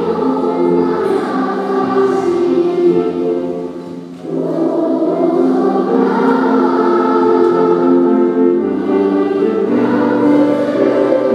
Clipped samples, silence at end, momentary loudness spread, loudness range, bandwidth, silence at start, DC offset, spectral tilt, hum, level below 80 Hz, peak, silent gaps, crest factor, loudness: under 0.1%; 0 s; 6 LU; 4 LU; 9.2 kHz; 0 s; under 0.1%; -8 dB/octave; none; -66 dBFS; 0 dBFS; none; 12 dB; -13 LUFS